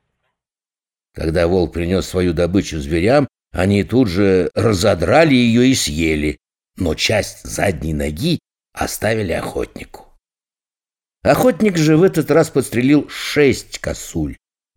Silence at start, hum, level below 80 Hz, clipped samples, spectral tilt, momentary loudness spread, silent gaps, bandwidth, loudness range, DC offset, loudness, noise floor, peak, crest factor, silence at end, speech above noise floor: 1.15 s; none; -36 dBFS; under 0.1%; -5.5 dB/octave; 12 LU; none; 19 kHz; 7 LU; under 0.1%; -17 LUFS; under -90 dBFS; 0 dBFS; 16 dB; 0.4 s; over 74 dB